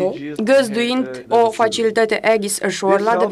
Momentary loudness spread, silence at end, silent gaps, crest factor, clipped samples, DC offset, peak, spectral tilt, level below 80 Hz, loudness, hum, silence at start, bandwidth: 5 LU; 0 s; none; 14 dB; under 0.1%; under 0.1%; -2 dBFS; -3.5 dB/octave; -60 dBFS; -17 LUFS; none; 0 s; 13.5 kHz